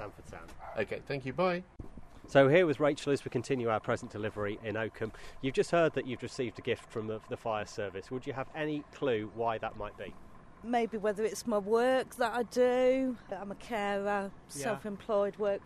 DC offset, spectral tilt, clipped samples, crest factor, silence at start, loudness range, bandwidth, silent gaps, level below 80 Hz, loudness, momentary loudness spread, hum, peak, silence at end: under 0.1%; -5.5 dB/octave; under 0.1%; 22 dB; 0 s; 6 LU; 13.5 kHz; none; -58 dBFS; -33 LUFS; 13 LU; none; -12 dBFS; 0 s